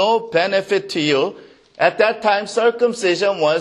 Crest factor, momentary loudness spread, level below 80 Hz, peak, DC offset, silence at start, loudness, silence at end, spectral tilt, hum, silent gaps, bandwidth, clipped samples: 16 dB; 3 LU; -68 dBFS; 0 dBFS; under 0.1%; 0 s; -18 LUFS; 0 s; -4 dB/octave; none; none; 11.5 kHz; under 0.1%